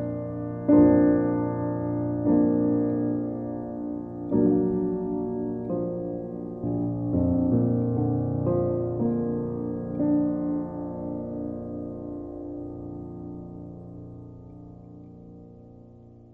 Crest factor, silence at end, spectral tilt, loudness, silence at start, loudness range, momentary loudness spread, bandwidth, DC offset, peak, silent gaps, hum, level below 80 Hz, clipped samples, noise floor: 18 dB; 0.05 s; -13.5 dB/octave; -26 LUFS; 0 s; 16 LU; 20 LU; 2.2 kHz; under 0.1%; -8 dBFS; none; none; -50 dBFS; under 0.1%; -49 dBFS